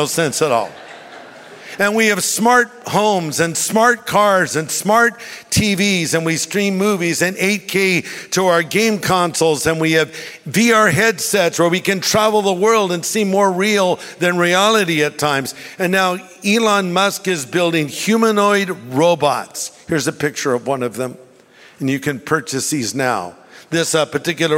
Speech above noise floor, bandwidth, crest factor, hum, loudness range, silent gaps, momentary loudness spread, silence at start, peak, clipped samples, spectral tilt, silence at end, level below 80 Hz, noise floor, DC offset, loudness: 29 dB; 16.5 kHz; 16 dB; none; 5 LU; none; 8 LU; 0 s; -2 dBFS; under 0.1%; -3.5 dB/octave; 0 s; -52 dBFS; -46 dBFS; under 0.1%; -16 LUFS